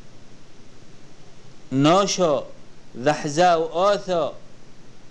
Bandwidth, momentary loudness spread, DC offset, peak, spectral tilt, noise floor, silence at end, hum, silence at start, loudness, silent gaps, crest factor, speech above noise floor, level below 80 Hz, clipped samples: 11 kHz; 11 LU; 1%; -6 dBFS; -4.5 dB/octave; -43 dBFS; 0.05 s; none; 0 s; -21 LUFS; none; 18 dB; 23 dB; -50 dBFS; under 0.1%